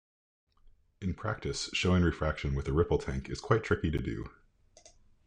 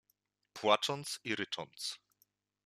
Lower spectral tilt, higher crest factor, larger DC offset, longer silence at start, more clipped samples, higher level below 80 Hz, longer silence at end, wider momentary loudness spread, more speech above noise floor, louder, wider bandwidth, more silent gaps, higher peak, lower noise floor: first, -6 dB/octave vs -2.5 dB/octave; about the same, 20 dB vs 24 dB; neither; first, 1 s vs 0.55 s; neither; first, -44 dBFS vs -82 dBFS; first, 0.95 s vs 0.7 s; second, 11 LU vs 14 LU; second, 30 dB vs 44 dB; first, -32 LUFS vs -35 LUFS; second, 10 kHz vs 14.5 kHz; neither; about the same, -12 dBFS vs -14 dBFS; second, -61 dBFS vs -80 dBFS